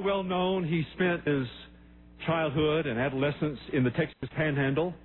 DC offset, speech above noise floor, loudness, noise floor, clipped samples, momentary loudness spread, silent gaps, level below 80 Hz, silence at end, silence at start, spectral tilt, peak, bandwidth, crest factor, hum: under 0.1%; 24 dB; -29 LUFS; -53 dBFS; under 0.1%; 6 LU; none; -54 dBFS; 0.05 s; 0 s; -10.5 dB/octave; -16 dBFS; 4.2 kHz; 14 dB; none